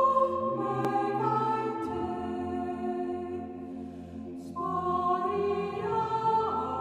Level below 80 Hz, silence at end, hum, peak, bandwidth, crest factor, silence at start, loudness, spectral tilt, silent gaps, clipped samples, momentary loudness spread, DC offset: -60 dBFS; 0 s; none; -14 dBFS; 12.5 kHz; 16 dB; 0 s; -30 LUFS; -7.5 dB/octave; none; under 0.1%; 13 LU; under 0.1%